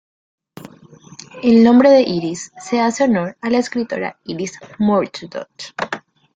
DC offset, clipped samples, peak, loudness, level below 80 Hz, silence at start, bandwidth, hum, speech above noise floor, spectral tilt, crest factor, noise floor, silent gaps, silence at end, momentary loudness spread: under 0.1%; under 0.1%; -2 dBFS; -16 LUFS; -58 dBFS; 0.6 s; 9 kHz; none; 27 dB; -5.5 dB/octave; 16 dB; -43 dBFS; none; 0.35 s; 19 LU